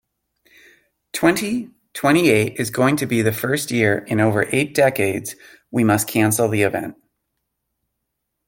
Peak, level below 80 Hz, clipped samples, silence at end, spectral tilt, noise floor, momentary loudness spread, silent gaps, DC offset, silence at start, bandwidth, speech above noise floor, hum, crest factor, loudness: 0 dBFS; -56 dBFS; under 0.1%; 1.55 s; -5 dB/octave; -77 dBFS; 11 LU; none; under 0.1%; 1.15 s; 17 kHz; 59 dB; none; 20 dB; -19 LUFS